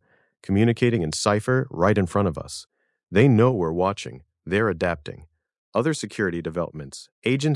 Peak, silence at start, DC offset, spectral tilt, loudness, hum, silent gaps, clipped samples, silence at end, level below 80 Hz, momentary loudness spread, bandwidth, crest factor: -4 dBFS; 0.5 s; under 0.1%; -6 dB/octave; -23 LUFS; none; 5.58-5.72 s, 7.12-7.22 s; under 0.1%; 0 s; -54 dBFS; 18 LU; 12 kHz; 18 dB